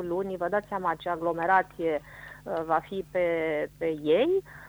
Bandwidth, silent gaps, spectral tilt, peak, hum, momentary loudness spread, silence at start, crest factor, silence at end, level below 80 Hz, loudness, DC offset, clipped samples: over 20 kHz; none; -6.5 dB/octave; -10 dBFS; 50 Hz at -55 dBFS; 9 LU; 0 s; 18 dB; 0 s; -58 dBFS; -28 LUFS; under 0.1%; under 0.1%